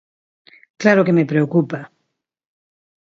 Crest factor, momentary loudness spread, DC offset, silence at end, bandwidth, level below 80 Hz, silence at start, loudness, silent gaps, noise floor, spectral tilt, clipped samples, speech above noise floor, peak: 20 dB; 11 LU; under 0.1%; 1.3 s; 7.6 kHz; -66 dBFS; 0.8 s; -17 LUFS; none; -74 dBFS; -7.5 dB/octave; under 0.1%; 59 dB; 0 dBFS